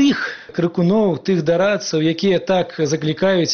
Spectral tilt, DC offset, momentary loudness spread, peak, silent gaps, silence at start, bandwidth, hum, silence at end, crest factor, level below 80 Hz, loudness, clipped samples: -5 dB/octave; 0.2%; 5 LU; -6 dBFS; none; 0 s; 6.8 kHz; none; 0 s; 10 dB; -56 dBFS; -18 LUFS; under 0.1%